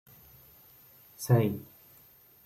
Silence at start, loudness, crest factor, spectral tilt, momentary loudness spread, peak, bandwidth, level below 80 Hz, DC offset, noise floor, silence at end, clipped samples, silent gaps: 1.2 s; -29 LUFS; 22 dB; -7 dB/octave; 27 LU; -10 dBFS; 15.5 kHz; -68 dBFS; under 0.1%; -59 dBFS; 0.85 s; under 0.1%; none